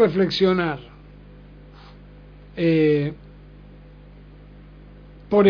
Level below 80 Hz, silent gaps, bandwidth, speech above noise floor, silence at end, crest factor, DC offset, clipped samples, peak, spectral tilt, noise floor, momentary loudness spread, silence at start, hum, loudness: -48 dBFS; none; 5.4 kHz; 25 dB; 0 s; 18 dB; under 0.1%; under 0.1%; -6 dBFS; -8 dB/octave; -44 dBFS; 21 LU; 0 s; 50 Hz at -45 dBFS; -21 LUFS